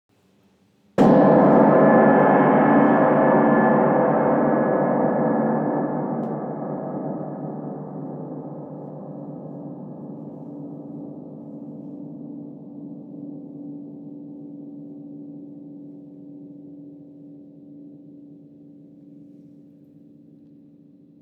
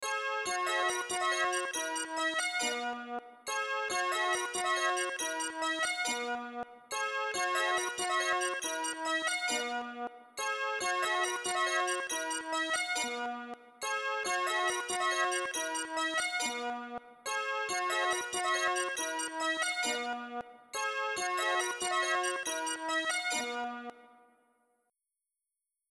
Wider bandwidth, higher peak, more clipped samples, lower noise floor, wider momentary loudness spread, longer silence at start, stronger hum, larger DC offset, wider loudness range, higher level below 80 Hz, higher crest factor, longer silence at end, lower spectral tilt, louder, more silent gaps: second, 5.8 kHz vs 13.5 kHz; first, -4 dBFS vs -18 dBFS; neither; second, -60 dBFS vs -90 dBFS; first, 24 LU vs 9 LU; first, 1 s vs 0 s; neither; neither; first, 24 LU vs 1 LU; first, -62 dBFS vs -80 dBFS; about the same, 18 dB vs 16 dB; first, 3.35 s vs 1.85 s; first, -10 dB/octave vs 0.5 dB/octave; first, -18 LUFS vs -33 LUFS; neither